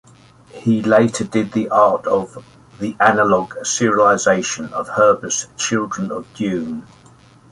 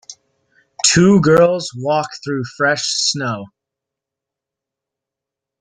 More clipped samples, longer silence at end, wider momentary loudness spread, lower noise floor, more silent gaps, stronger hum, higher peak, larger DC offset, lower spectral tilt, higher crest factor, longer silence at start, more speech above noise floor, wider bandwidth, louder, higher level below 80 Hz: neither; second, 0.7 s vs 2.15 s; about the same, 11 LU vs 13 LU; second, -47 dBFS vs -85 dBFS; neither; neither; about the same, 0 dBFS vs 0 dBFS; neither; about the same, -4 dB/octave vs -4 dB/octave; about the same, 18 dB vs 18 dB; first, 0.55 s vs 0.1 s; second, 30 dB vs 69 dB; about the same, 11.5 kHz vs 11 kHz; about the same, -17 LUFS vs -15 LUFS; about the same, -56 dBFS vs -52 dBFS